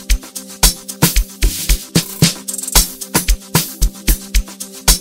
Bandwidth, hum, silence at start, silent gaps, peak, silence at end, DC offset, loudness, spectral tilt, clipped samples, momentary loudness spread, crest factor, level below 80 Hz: over 20 kHz; none; 0 s; none; 0 dBFS; 0 s; under 0.1%; -16 LUFS; -2.5 dB/octave; 0.1%; 8 LU; 16 dB; -18 dBFS